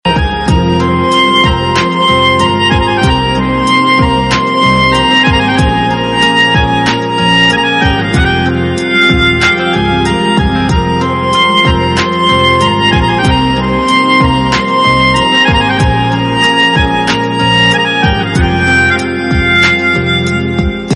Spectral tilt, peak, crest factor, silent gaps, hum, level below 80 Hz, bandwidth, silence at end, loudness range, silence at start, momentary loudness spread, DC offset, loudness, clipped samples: -5 dB/octave; 0 dBFS; 10 dB; none; none; -22 dBFS; 11.5 kHz; 0 s; 1 LU; 0.05 s; 4 LU; under 0.1%; -9 LUFS; under 0.1%